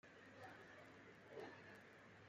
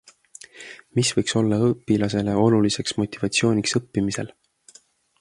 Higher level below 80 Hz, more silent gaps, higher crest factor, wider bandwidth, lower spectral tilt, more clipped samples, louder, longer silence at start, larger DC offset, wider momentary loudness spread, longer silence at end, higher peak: second, under -90 dBFS vs -54 dBFS; neither; about the same, 18 dB vs 18 dB; first, 14.5 kHz vs 11.5 kHz; about the same, -5 dB/octave vs -5 dB/octave; neither; second, -60 LUFS vs -22 LUFS; second, 0.05 s vs 0.55 s; neither; second, 6 LU vs 18 LU; second, 0 s vs 0.95 s; second, -42 dBFS vs -4 dBFS